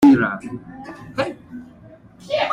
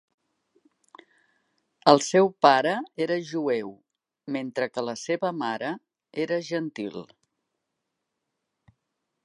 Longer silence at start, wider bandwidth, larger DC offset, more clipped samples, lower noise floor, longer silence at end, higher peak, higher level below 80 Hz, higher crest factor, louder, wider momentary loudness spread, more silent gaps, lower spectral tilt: second, 0 s vs 1.85 s; second, 10 kHz vs 11.5 kHz; neither; neither; second, -45 dBFS vs -82 dBFS; second, 0 s vs 2.2 s; about the same, -2 dBFS vs -2 dBFS; first, -54 dBFS vs -78 dBFS; second, 18 dB vs 26 dB; first, -22 LUFS vs -25 LUFS; first, 22 LU vs 17 LU; neither; first, -6.5 dB/octave vs -4.5 dB/octave